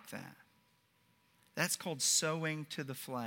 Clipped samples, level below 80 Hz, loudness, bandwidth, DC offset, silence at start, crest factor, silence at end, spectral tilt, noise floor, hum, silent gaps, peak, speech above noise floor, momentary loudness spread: under 0.1%; -88 dBFS; -35 LUFS; 17 kHz; under 0.1%; 0 s; 24 dB; 0 s; -2.5 dB/octave; -73 dBFS; none; none; -16 dBFS; 36 dB; 18 LU